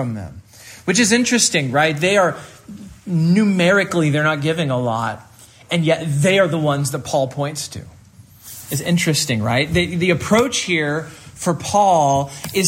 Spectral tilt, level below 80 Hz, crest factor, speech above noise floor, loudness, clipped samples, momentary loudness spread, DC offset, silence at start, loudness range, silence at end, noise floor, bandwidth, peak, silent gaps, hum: -4.5 dB/octave; -50 dBFS; 16 dB; 28 dB; -17 LUFS; under 0.1%; 16 LU; under 0.1%; 0 s; 4 LU; 0 s; -45 dBFS; 16 kHz; -2 dBFS; none; none